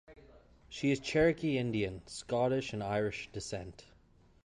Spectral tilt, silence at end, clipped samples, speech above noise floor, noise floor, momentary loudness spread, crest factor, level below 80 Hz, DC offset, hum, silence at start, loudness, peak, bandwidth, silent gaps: -5.5 dB/octave; 0.65 s; under 0.1%; 30 dB; -64 dBFS; 14 LU; 18 dB; -58 dBFS; under 0.1%; none; 0.1 s; -34 LUFS; -16 dBFS; 11.5 kHz; none